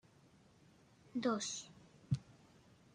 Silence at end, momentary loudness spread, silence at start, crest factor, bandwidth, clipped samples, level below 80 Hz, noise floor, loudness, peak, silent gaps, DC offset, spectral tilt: 0.6 s; 23 LU; 1.15 s; 22 dB; 10.5 kHz; under 0.1%; -74 dBFS; -67 dBFS; -41 LUFS; -24 dBFS; none; under 0.1%; -5 dB/octave